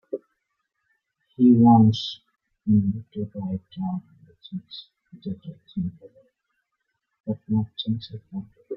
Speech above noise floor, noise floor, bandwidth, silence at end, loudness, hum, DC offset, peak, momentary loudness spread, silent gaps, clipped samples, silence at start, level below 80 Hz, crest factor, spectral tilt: 56 dB; -79 dBFS; 6.8 kHz; 0 s; -23 LUFS; none; under 0.1%; -4 dBFS; 22 LU; 7.20-7.24 s; under 0.1%; 0.15 s; -60 dBFS; 20 dB; -9 dB/octave